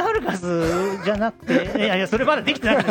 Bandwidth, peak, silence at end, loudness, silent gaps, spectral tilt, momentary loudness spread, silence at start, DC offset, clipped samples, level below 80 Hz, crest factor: 17.5 kHz; -4 dBFS; 0 s; -21 LUFS; none; -5 dB/octave; 4 LU; 0 s; under 0.1%; under 0.1%; -44 dBFS; 16 dB